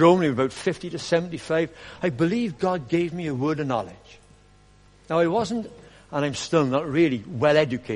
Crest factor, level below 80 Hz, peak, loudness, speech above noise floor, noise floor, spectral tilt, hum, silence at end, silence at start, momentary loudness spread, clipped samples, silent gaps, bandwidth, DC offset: 20 dB; -56 dBFS; -4 dBFS; -24 LUFS; 31 dB; -54 dBFS; -6 dB/octave; 50 Hz at -55 dBFS; 0 s; 0 s; 8 LU; under 0.1%; none; 10.5 kHz; under 0.1%